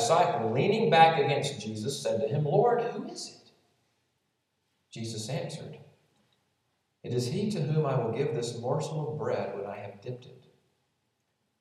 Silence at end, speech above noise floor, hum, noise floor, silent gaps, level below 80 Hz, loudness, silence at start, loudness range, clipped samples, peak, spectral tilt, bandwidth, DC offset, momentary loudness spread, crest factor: 1.25 s; 50 dB; none; -78 dBFS; none; -78 dBFS; -28 LUFS; 0 s; 15 LU; under 0.1%; -6 dBFS; -5.5 dB/octave; 13.5 kHz; under 0.1%; 18 LU; 24 dB